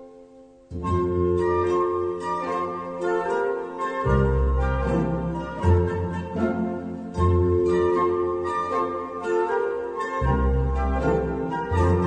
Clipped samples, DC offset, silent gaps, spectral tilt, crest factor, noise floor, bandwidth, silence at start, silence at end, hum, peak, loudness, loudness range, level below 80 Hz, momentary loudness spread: under 0.1%; under 0.1%; none; -8.5 dB/octave; 14 dB; -49 dBFS; 9 kHz; 0 s; 0 s; none; -8 dBFS; -24 LUFS; 1 LU; -32 dBFS; 7 LU